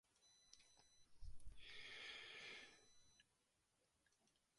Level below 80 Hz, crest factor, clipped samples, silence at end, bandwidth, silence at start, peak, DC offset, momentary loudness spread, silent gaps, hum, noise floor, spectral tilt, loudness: -70 dBFS; 16 dB; under 0.1%; 1.35 s; 11 kHz; 0.2 s; -44 dBFS; under 0.1%; 14 LU; none; none; -86 dBFS; -1.5 dB/octave; -58 LUFS